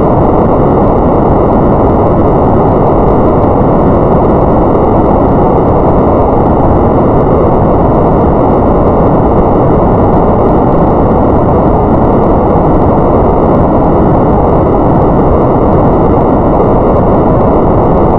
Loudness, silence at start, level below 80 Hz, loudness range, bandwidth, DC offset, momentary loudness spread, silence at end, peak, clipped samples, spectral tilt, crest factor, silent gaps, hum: -7 LUFS; 0 s; -16 dBFS; 0 LU; 5.2 kHz; under 0.1%; 0 LU; 0 s; 0 dBFS; 0.3%; -12 dB/octave; 6 dB; none; none